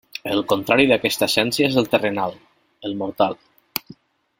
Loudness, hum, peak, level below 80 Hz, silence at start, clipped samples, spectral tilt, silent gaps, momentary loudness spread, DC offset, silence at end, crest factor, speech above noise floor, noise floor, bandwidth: -20 LUFS; none; 0 dBFS; -58 dBFS; 0.25 s; under 0.1%; -4 dB/octave; none; 13 LU; under 0.1%; 0.45 s; 22 dB; 27 dB; -47 dBFS; 16.5 kHz